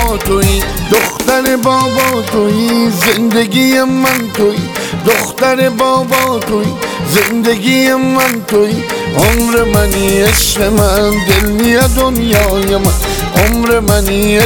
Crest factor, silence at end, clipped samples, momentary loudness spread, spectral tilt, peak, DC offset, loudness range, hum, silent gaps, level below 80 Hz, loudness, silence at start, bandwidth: 10 dB; 0 s; under 0.1%; 4 LU; -4.5 dB/octave; 0 dBFS; 0.3%; 2 LU; none; none; -22 dBFS; -11 LUFS; 0 s; over 20 kHz